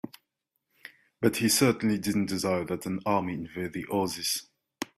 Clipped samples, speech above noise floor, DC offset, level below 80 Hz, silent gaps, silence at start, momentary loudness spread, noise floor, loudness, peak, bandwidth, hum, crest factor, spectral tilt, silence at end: under 0.1%; 54 dB; under 0.1%; -64 dBFS; none; 0.05 s; 12 LU; -81 dBFS; -28 LUFS; -10 dBFS; 16 kHz; none; 20 dB; -4 dB/octave; 0.15 s